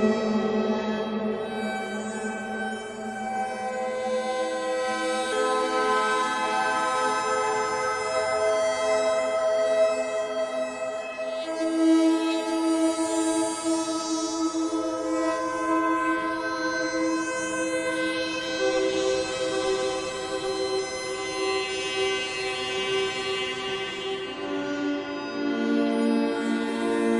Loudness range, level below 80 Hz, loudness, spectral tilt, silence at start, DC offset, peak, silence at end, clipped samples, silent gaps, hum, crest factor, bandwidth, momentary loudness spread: 4 LU; -62 dBFS; -26 LUFS; -3 dB/octave; 0 s; under 0.1%; -10 dBFS; 0 s; under 0.1%; none; none; 16 dB; 11.5 kHz; 7 LU